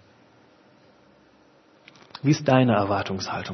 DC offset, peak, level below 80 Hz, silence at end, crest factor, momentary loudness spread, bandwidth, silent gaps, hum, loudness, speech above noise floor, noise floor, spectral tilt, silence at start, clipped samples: under 0.1%; -4 dBFS; -66 dBFS; 0 s; 22 dB; 10 LU; 6.4 kHz; none; none; -22 LUFS; 35 dB; -57 dBFS; -6.5 dB/octave; 2.15 s; under 0.1%